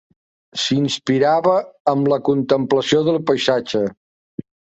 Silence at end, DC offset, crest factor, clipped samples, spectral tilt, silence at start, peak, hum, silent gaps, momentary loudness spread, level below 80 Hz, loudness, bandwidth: 0.35 s; under 0.1%; 16 dB; under 0.1%; -5.5 dB/octave; 0.55 s; -2 dBFS; none; 1.80-1.85 s, 3.97-4.38 s; 14 LU; -60 dBFS; -18 LUFS; 8.2 kHz